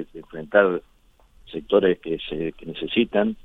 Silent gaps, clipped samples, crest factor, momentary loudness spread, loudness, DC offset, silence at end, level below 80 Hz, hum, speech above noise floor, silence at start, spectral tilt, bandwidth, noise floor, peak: none; under 0.1%; 20 dB; 17 LU; -23 LUFS; under 0.1%; 0.1 s; -50 dBFS; none; 33 dB; 0 s; -8 dB/octave; 4.1 kHz; -55 dBFS; -4 dBFS